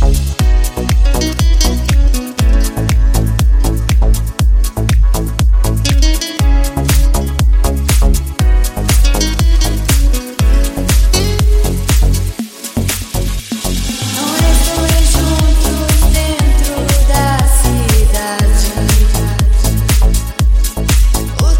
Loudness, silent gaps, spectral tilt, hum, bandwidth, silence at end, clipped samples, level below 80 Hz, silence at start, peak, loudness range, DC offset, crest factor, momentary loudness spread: -13 LUFS; none; -4.5 dB/octave; none; 17 kHz; 0 s; under 0.1%; -12 dBFS; 0 s; 0 dBFS; 2 LU; under 0.1%; 10 dB; 4 LU